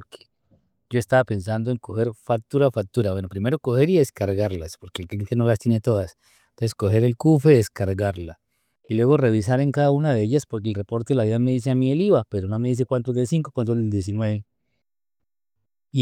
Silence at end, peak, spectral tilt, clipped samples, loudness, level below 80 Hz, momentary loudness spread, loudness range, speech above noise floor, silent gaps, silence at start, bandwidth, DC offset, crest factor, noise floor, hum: 0 s; -4 dBFS; -7.5 dB/octave; under 0.1%; -22 LUFS; -58 dBFS; 9 LU; 4 LU; 65 dB; none; 0 s; 15 kHz; under 0.1%; 18 dB; -86 dBFS; none